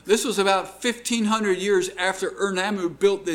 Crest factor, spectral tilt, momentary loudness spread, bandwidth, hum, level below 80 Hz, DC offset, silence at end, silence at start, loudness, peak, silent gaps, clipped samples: 16 dB; -3.5 dB/octave; 5 LU; 17.5 kHz; none; -60 dBFS; under 0.1%; 0 s; 0.05 s; -23 LUFS; -6 dBFS; none; under 0.1%